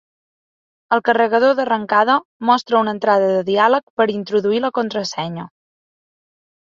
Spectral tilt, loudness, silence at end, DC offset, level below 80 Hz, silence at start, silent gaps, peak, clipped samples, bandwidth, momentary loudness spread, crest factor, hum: -5 dB/octave; -17 LUFS; 1.2 s; under 0.1%; -66 dBFS; 0.9 s; 2.25-2.40 s, 3.83-3.97 s; -2 dBFS; under 0.1%; 7.6 kHz; 7 LU; 16 dB; none